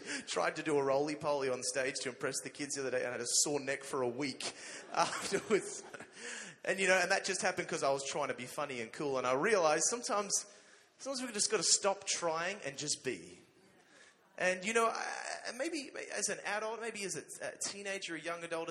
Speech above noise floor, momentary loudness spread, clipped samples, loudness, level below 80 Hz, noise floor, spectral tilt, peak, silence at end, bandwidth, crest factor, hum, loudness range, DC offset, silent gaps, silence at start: 29 dB; 11 LU; under 0.1%; -35 LUFS; -82 dBFS; -65 dBFS; -2 dB/octave; -14 dBFS; 0 s; 13.5 kHz; 22 dB; none; 5 LU; under 0.1%; none; 0 s